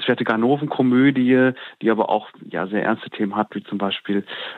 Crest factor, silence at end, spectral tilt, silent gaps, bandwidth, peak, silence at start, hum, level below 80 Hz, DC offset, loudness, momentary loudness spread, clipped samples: 16 dB; 0 s; -8.5 dB/octave; none; 4.4 kHz; -4 dBFS; 0 s; none; -76 dBFS; under 0.1%; -20 LUFS; 9 LU; under 0.1%